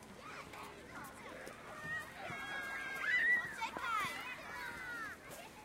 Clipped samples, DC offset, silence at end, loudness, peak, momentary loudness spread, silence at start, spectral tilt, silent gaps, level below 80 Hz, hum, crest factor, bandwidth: under 0.1%; under 0.1%; 0 s; -39 LUFS; -24 dBFS; 18 LU; 0 s; -2.5 dB/octave; none; -70 dBFS; none; 18 dB; 16 kHz